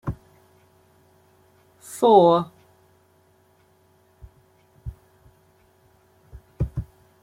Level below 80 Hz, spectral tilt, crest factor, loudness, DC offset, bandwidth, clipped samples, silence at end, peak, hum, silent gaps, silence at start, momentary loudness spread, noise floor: -46 dBFS; -7 dB/octave; 24 dB; -20 LUFS; under 0.1%; 16 kHz; under 0.1%; 0.4 s; -2 dBFS; none; none; 0.05 s; 26 LU; -60 dBFS